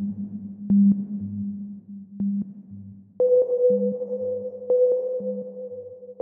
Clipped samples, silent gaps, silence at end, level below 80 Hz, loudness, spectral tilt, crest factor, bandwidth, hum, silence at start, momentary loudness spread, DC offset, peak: under 0.1%; none; 0 s; -68 dBFS; -24 LUFS; -15.5 dB/octave; 14 dB; 1.2 kHz; none; 0 s; 20 LU; under 0.1%; -12 dBFS